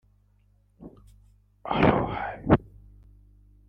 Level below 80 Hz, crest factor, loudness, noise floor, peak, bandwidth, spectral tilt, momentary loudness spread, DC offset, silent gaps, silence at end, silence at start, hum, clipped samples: -46 dBFS; 26 dB; -25 LUFS; -63 dBFS; -4 dBFS; 5.8 kHz; -9.5 dB/octave; 18 LU; under 0.1%; none; 1.05 s; 0.8 s; 50 Hz at -50 dBFS; under 0.1%